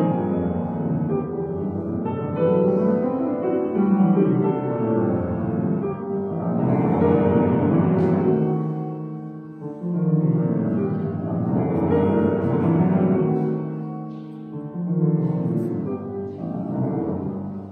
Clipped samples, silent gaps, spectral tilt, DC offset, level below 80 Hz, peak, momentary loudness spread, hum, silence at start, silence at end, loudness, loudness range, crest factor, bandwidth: under 0.1%; none; -12 dB/octave; under 0.1%; -54 dBFS; -6 dBFS; 11 LU; none; 0 s; 0 s; -22 LUFS; 4 LU; 16 dB; 3.6 kHz